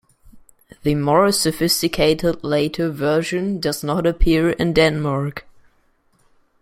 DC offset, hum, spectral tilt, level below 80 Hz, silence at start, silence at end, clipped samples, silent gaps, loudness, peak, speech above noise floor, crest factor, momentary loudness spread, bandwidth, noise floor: under 0.1%; none; -5 dB/octave; -32 dBFS; 0.35 s; 1.2 s; under 0.1%; none; -19 LUFS; -2 dBFS; 42 dB; 18 dB; 7 LU; 16 kHz; -60 dBFS